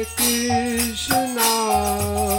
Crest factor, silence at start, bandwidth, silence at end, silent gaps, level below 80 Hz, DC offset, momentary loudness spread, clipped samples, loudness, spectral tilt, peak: 16 dB; 0 s; 18 kHz; 0 s; none; -38 dBFS; under 0.1%; 4 LU; under 0.1%; -20 LUFS; -3 dB/octave; -4 dBFS